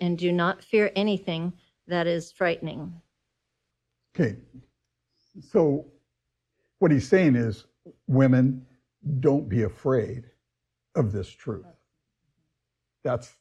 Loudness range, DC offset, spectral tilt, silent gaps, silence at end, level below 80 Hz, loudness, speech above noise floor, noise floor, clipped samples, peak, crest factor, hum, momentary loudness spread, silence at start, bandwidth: 9 LU; under 0.1%; -7.5 dB/octave; none; 0.15 s; -60 dBFS; -25 LUFS; 58 dB; -82 dBFS; under 0.1%; -6 dBFS; 20 dB; none; 17 LU; 0 s; 9.4 kHz